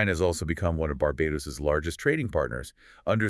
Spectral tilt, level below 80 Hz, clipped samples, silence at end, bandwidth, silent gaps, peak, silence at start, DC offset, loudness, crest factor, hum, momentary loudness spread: -6 dB/octave; -42 dBFS; under 0.1%; 0 s; 12 kHz; none; -10 dBFS; 0 s; under 0.1%; -28 LUFS; 18 dB; none; 7 LU